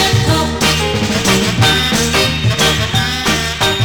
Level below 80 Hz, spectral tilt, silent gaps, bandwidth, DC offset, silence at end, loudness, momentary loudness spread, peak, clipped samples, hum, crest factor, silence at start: -28 dBFS; -3.5 dB/octave; none; 19.5 kHz; 0.2%; 0 s; -13 LUFS; 3 LU; 0 dBFS; under 0.1%; none; 12 dB; 0 s